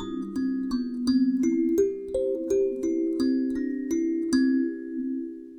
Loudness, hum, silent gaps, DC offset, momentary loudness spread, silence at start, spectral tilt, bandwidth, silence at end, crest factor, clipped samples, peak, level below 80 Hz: -26 LUFS; none; none; under 0.1%; 8 LU; 0 s; -5.5 dB/octave; 13 kHz; 0 s; 14 dB; under 0.1%; -12 dBFS; -56 dBFS